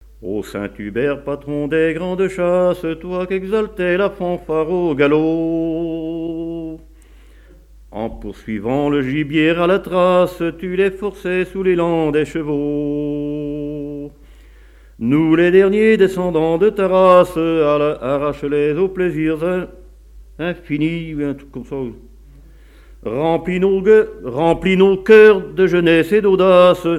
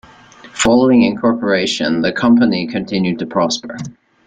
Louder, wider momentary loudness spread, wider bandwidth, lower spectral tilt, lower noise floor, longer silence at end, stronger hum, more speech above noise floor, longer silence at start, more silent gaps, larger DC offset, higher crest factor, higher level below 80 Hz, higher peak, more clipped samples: about the same, -16 LUFS vs -15 LUFS; about the same, 15 LU vs 13 LU; first, 13.5 kHz vs 9.4 kHz; first, -7.5 dB/octave vs -4.5 dB/octave; about the same, -43 dBFS vs -41 dBFS; second, 0 s vs 0.35 s; neither; about the same, 28 dB vs 27 dB; second, 0.2 s vs 0.45 s; neither; neither; about the same, 16 dB vs 14 dB; first, -42 dBFS vs -48 dBFS; about the same, 0 dBFS vs -2 dBFS; neither